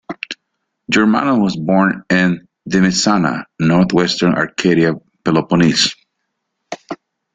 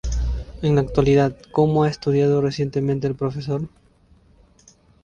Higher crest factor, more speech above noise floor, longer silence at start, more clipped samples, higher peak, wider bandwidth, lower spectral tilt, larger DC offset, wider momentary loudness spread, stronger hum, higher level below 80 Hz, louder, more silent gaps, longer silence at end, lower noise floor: about the same, 14 dB vs 18 dB; first, 59 dB vs 35 dB; about the same, 0.1 s vs 0.05 s; neither; about the same, -2 dBFS vs -4 dBFS; first, 9.4 kHz vs 7.4 kHz; second, -5 dB/octave vs -7.5 dB/octave; neither; first, 16 LU vs 9 LU; neither; second, -50 dBFS vs -34 dBFS; first, -15 LUFS vs -21 LUFS; neither; second, 0.4 s vs 1.35 s; first, -73 dBFS vs -55 dBFS